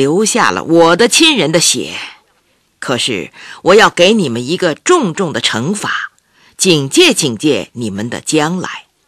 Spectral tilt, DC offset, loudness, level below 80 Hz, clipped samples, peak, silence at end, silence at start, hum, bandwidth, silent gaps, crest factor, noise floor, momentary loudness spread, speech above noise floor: -3 dB/octave; under 0.1%; -11 LUFS; -52 dBFS; 0.2%; 0 dBFS; 0.25 s; 0 s; none; 13.5 kHz; none; 12 dB; -57 dBFS; 14 LU; 45 dB